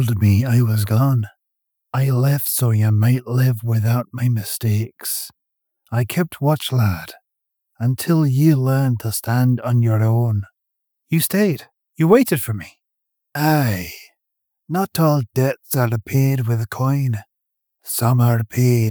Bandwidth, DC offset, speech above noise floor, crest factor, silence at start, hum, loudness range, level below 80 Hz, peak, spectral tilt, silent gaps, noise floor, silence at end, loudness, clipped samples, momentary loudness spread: over 20 kHz; under 0.1%; 61 dB; 16 dB; 0 s; none; 3 LU; -54 dBFS; -4 dBFS; -6.5 dB/octave; none; -79 dBFS; 0 s; -19 LUFS; under 0.1%; 10 LU